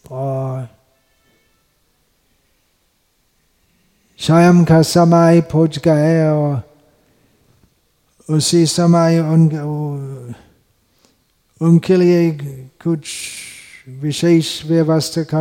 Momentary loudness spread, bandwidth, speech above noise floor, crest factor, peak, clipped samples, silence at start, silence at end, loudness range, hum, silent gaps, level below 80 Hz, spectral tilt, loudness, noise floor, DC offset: 18 LU; 15.5 kHz; 48 dB; 14 dB; -2 dBFS; under 0.1%; 0.1 s; 0 s; 5 LU; none; none; -54 dBFS; -6.5 dB/octave; -14 LUFS; -62 dBFS; under 0.1%